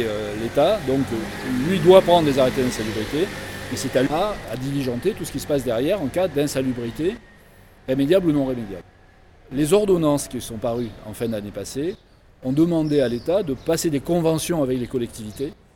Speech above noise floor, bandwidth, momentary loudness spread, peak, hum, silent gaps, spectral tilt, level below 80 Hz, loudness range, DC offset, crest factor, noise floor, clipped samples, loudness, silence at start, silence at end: 29 dB; 18 kHz; 12 LU; 0 dBFS; none; none; -5.5 dB/octave; -44 dBFS; 5 LU; under 0.1%; 20 dB; -50 dBFS; under 0.1%; -22 LUFS; 0 s; 0.2 s